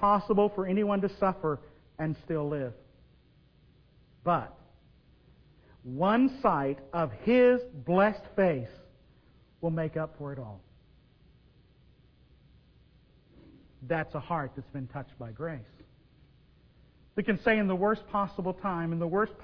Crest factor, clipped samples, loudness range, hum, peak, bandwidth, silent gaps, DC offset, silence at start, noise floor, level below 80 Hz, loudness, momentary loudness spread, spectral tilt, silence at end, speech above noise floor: 22 dB; under 0.1%; 12 LU; none; -10 dBFS; 5.4 kHz; none; under 0.1%; 0 s; -62 dBFS; -58 dBFS; -30 LUFS; 16 LU; -9.5 dB/octave; 0 s; 33 dB